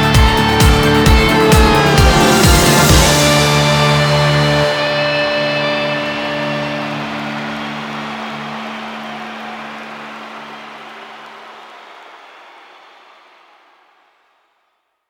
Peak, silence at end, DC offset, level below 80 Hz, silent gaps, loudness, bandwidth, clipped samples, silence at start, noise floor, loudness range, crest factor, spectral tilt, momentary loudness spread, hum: 0 dBFS; 2.95 s; under 0.1%; -22 dBFS; none; -12 LUFS; 19.5 kHz; under 0.1%; 0 s; -66 dBFS; 21 LU; 14 dB; -4.5 dB/octave; 21 LU; none